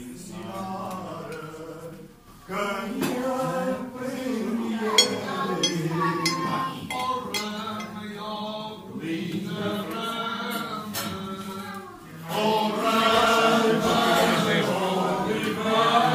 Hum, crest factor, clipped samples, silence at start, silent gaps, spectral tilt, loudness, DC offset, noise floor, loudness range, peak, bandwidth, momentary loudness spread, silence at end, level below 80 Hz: none; 24 dB; under 0.1%; 0 s; none; -4 dB/octave; -25 LUFS; under 0.1%; -47 dBFS; 9 LU; -2 dBFS; 16 kHz; 16 LU; 0 s; -60 dBFS